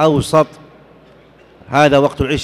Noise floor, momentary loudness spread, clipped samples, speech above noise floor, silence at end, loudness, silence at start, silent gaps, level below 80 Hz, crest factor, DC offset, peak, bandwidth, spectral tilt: -45 dBFS; 7 LU; under 0.1%; 32 dB; 0 s; -14 LUFS; 0 s; none; -38 dBFS; 14 dB; under 0.1%; -2 dBFS; 14 kHz; -6 dB/octave